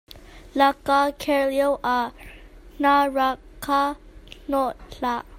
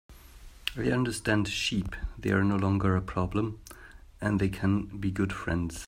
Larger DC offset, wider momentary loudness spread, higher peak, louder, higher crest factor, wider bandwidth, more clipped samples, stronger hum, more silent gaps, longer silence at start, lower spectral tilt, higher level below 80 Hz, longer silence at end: neither; about the same, 12 LU vs 10 LU; first, -4 dBFS vs -10 dBFS; first, -23 LUFS vs -29 LUFS; about the same, 20 dB vs 18 dB; about the same, 16 kHz vs 16 kHz; neither; neither; neither; about the same, 0.15 s vs 0.1 s; second, -4 dB/octave vs -6 dB/octave; about the same, -48 dBFS vs -44 dBFS; about the same, 0 s vs 0 s